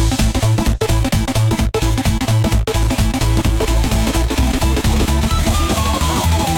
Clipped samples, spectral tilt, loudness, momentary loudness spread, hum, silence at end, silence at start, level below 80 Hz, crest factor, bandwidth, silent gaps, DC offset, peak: under 0.1%; -5 dB/octave; -16 LUFS; 1 LU; none; 0 s; 0 s; -18 dBFS; 10 dB; 17.5 kHz; none; under 0.1%; -6 dBFS